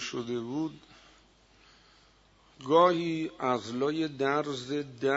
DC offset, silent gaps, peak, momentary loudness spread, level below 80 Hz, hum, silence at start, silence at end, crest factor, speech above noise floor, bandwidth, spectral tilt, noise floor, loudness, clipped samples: under 0.1%; none; -10 dBFS; 12 LU; -68 dBFS; none; 0 s; 0 s; 22 dB; 33 dB; 8 kHz; -5.5 dB/octave; -62 dBFS; -29 LUFS; under 0.1%